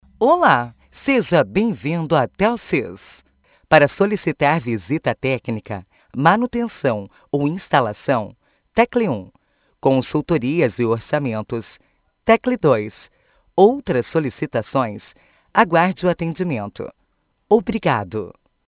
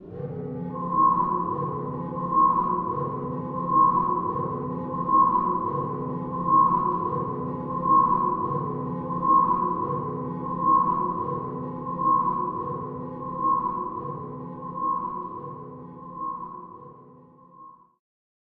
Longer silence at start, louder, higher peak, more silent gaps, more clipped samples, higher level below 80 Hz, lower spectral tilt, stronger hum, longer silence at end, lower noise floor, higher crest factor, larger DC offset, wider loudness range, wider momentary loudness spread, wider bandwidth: first, 0.2 s vs 0 s; first, -19 LUFS vs -25 LUFS; first, 0 dBFS vs -10 dBFS; neither; neither; about the same, -50 dBFS vs -54 dBFS; second, -10.5 dB/octave vs -12.5 dB/octave; neither; second, 0.4 s vs 0.7 s; first, -66 dBFS vs -51 dBFS; about the same, 20 dB vs 16 dB; neither; second, 2 LU vs 10 LU; about the same, 13 LU vs 15 LU; first, 4 kHz vs 3 kHz